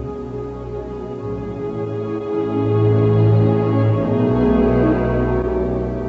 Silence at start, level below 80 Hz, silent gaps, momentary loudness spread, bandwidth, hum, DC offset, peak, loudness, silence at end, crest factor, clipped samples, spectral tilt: 0 s; -32 dBFS; none; 13 LU; 4.7 kHz; none; under 0.1%; -6 dBFS; -18 LUFS; 0 s; 12 dB; under 0.1%; -10.5 dB/octave